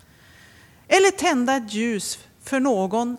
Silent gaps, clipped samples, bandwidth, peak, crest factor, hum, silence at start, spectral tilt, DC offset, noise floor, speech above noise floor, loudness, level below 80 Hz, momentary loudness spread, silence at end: none; under 0.1%; 15.5 kHz; -4 dBFS; 20 dB; none; 0.9 s; -3.5 dB/octave; under 0.1%; -51 dBFS; 30 dB; -21 LUFS; -62 dBFS; 10 LU; 0 s